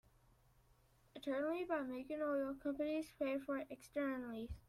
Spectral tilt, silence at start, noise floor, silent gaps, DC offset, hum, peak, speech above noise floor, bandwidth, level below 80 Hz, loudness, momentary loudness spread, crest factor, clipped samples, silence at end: -6 dB/octave; 1.15 s; -72 dBFS; none; under 0.1%; none; -26 dBFS; 30 dB; 15 kHz; -66 dBFS; -43 LUFS; 6 LU; 16 dB; under 0.1%; 0.1 s